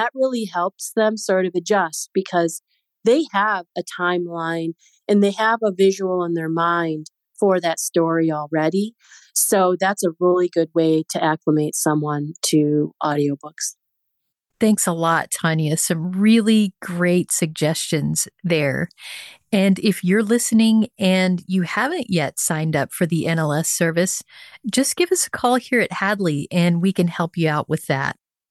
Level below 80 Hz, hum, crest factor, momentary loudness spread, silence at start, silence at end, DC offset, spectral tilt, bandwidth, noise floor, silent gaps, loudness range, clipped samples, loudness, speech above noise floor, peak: -66 dBFS; none; 14 dB; 7 LU; 0 s; 0.4 s; under 0.1%; -4.5 dB/octave; 13 kHz; -76 dBFS; none; 3 LU; under 0.1%; -20 LUFS; 56 dB; -6 dBFS